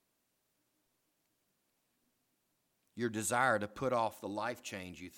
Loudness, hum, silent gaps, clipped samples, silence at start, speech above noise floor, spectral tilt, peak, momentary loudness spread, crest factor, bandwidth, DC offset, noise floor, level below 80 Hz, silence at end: -36 LUFS; none; none; under 0.1%; 2.95 s; 45 dB; -4 dB/octave; -16 dBFS; 13 LU; 24 dB; 18.5 kHz; under 0.1%; -81 dBFS; -74 dBFS; 0 s